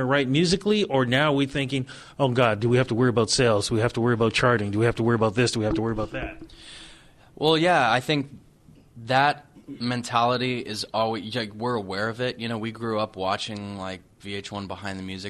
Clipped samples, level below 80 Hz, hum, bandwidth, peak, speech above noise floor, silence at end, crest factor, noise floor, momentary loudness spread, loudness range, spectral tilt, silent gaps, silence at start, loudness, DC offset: under 0.1%; -50 dBFS; none; 13 kHz; -6 dBFS; 29 dB; 0 s; 18 dB; -53 dBFS; 14 LU; 6 LU; -5 dB/octave; none; 0 s; -24 LUFS; under 0.1%